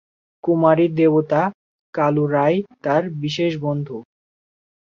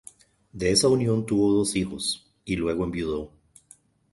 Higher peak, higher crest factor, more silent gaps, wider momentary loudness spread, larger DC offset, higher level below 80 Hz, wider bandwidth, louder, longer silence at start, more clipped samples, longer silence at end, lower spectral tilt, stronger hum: first, -2 dBFS vs -8 dBFS; about the same, 18 dB vs 18 dB; first, 1.54-1.93 s vs none; about the same, 11 LU vs 11 LU; neither; second, -64 dBFS vs -48 dBFS; second, 7.2 kHz vs 12 kHz; first, -19 LUFS vs -25 LUFS; about the same, 0.45 s vs 0.55 s; neither; about the same, 0.85 s vs 0.85 s; first, -8 dB/octave vs -4.5 dB/octave; neither